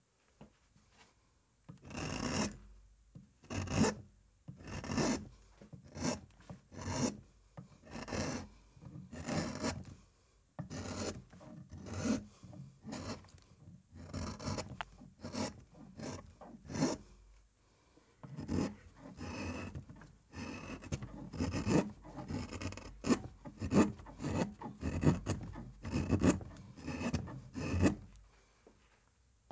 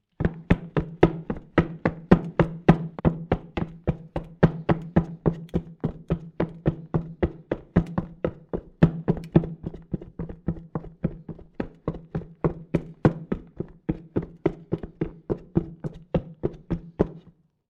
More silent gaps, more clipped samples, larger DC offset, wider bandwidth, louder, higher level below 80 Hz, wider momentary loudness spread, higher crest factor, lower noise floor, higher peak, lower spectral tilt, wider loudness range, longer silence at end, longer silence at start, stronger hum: neither; neither; neither; first, 8 kHz vs 5.8 kHz; second, -39 LUFS vs -27 LUFS; second, -52 dBFS vs -40 dBFS; first, 23 LU vs 13 LU; about the same, 26 dB vs 24 dB; first, -72 dBFS vs -56 dBFS; second, -14 dBFS vs -4 dBFS; second, -5.5 dB/octave vs -10 dB/octave; about the same, 8 LU vs 7 LU; first, 1.25 s vs 0.5 s; first, 0.4 s vs 0.2 s; neither